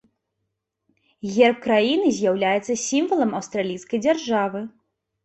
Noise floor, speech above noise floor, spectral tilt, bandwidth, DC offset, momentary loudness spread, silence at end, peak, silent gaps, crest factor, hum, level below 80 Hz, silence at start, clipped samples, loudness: -78 dBFS; 57 dB; -4 dB/octave; 8.4 kHz; under 0.1%; 9 LU; 0.55 s; -4 dBFS; none; 20 dB; none; -66 dBFS; 1.25 s; under 0.1%; -21 LUFS